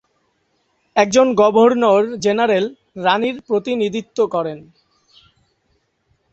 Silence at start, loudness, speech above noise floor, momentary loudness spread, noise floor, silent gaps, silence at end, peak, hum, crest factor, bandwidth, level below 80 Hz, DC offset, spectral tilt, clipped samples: 0.95 s; -17 LUFS; 50 dB; 10 LU; -65 dBFS; none; 1.7 s; 0 dBFS; none; 18 dB; 8.2 kHz; -60 dBFS; under 0.1%; -4.5 dB/octave; under 0.1%